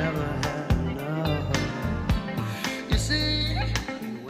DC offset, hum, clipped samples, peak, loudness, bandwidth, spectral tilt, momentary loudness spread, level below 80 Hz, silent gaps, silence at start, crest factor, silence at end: under 0.1%; none; under 0.1%; -8 dBFS; -27 LUFS; 15.5 kHz; -5 dB/octave; 6 LU; -34 dBFS; none; 0 s; 18 dB; 0 s